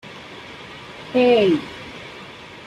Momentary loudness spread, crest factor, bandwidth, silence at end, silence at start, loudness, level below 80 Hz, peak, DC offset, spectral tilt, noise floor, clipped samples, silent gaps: 22 LU; 16 dB; 10.5 kHz; 0.05 s; 0.05 s; -18 LUFS; -58 dBFS; -6 dBFS; under 0.1%; -6 dB/octave; -39 dBFS; under 0.1%; none